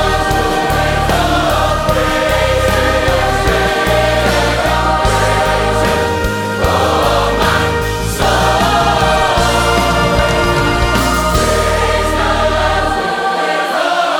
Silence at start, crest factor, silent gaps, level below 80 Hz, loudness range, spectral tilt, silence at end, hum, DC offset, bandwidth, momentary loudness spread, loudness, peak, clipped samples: 0 s; 12 dB; none; -22 dBFS; 1 LU; -4.5 dB/octave; 0 s; none; under 0.1%; over 20 kHz; 3 LU; -13 LUFS; 0 dBFS; under 0.1%